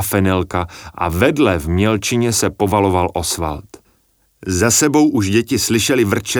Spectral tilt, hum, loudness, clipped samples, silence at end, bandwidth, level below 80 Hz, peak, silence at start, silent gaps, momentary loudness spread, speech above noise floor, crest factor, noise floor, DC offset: -4.5 dB/octave; none; -16 LUFS; under 0.1%; 0 s; over 20 kHz; -38 dBFS; -2 dBFS; 0 s; none; 10 LU; 44 dB; 16 dB; -59 dBFS; under 0.1%